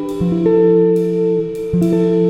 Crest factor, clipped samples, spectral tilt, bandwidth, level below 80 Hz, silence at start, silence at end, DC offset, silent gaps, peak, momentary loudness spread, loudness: 10 dB; under 0.1%; -9.5 dB/octave; 10.5 kHz; -44 dBFS; 0 s; 0 s; under 0.1%; none; -2 dBFS; 7 LU; -15 LUFS